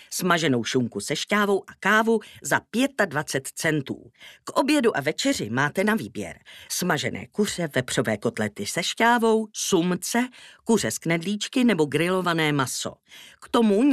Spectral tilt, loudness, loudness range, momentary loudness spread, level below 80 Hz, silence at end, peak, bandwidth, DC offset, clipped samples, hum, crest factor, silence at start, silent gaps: -4 dB/octave; -24 LUFS; 2 LU; 8 LU; -64 dBFS; 0 s; -6 dBFS; 15 kHz; under 0.1%; under 0.1%; none; 18 dB; 0 s; none